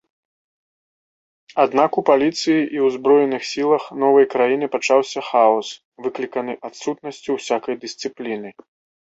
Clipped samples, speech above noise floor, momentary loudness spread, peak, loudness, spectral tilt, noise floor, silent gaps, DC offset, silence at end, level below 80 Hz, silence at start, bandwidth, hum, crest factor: under 0.1%; over 71 dB; 13 LU; -2 dBFS; -19 LUFS; -4.5 dB/octave; under -90 dBFS; 5.85-5.92 s; under 0.1%; 0.55 s; -68 dBFS; 1.55 s; 8 kHz; none; 18 dB